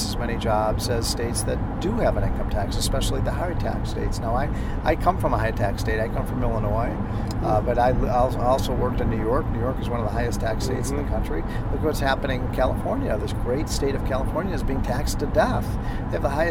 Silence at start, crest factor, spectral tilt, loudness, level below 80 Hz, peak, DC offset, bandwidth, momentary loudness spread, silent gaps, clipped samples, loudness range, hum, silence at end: 0 s; 18 dB; -6 dB/octave; -24 LUFS; -28 dBFS; -4 dBFS; under 0.1%; 16.5 kHz; 5 LU; none; under 0.1%; 2 LU; none; 0 s